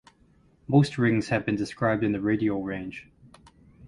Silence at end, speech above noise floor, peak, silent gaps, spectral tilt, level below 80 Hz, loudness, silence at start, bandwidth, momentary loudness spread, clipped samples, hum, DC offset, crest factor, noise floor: 0 s; 36 dB; -8 dBFS; none; -7.5 dB/octave; -56 dBFS; -26 LUFS; 0.7 s; 11.5 kHz; 12 LU; under 0.1%; none; under 0.1%; 20 dB; -61 dBFS